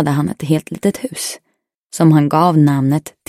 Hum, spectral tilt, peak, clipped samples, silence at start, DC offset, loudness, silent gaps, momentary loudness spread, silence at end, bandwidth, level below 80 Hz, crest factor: none; -6.5 dB/octave; 0 dBFS; under 0.1%; 0 s; under 0.1%; -15 LUFS; 1.77-1.90 s; 12 LU; 0.2 s; 15 kHz; -54 dBFS; 14 dB